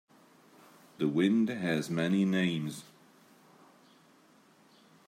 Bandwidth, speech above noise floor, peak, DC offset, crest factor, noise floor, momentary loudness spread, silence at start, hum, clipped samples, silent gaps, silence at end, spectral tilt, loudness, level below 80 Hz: 15 kHz; 33 dB; -16 dBFS; under 0.1%; 18 dB; -62 dBFS; 9 LU; 1 s; none; under 0.1%; none; 2.25 s; -6.5 dB/octave; -30 LUFS; -78 dBFS